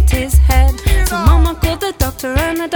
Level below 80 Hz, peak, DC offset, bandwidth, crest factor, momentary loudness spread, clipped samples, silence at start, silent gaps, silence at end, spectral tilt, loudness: -14 dBFS; 0 dBFS; under 0.1%; over 20 kHz; 12 dB; 6 LU; under 0.1%; 0 s; none; 0 s; -5.5 dB/octave; -14 LUFS